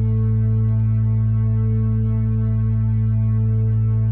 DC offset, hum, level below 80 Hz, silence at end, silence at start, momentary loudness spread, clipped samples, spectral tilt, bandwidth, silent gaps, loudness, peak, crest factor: under 0.1%; none; -30 dBFS; 0 s; 0 s; 1 LU; under 0.1%; -14.5 dB/octave; 2.3 kHz; none; -19 LUFS; -12 dBFS; 6 dB